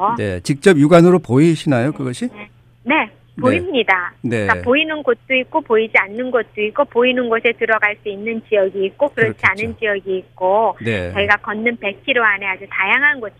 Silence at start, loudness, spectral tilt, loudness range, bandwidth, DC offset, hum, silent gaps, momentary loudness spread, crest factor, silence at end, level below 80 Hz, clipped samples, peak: 0 s; -16 LUFS; -6 dB/octave; 3 LU; 13 kHz; under 0.1%; none; none; 9 LU; 16 dB; 0.1 s; -52 dBFS; under 0.1%; 0 dBFS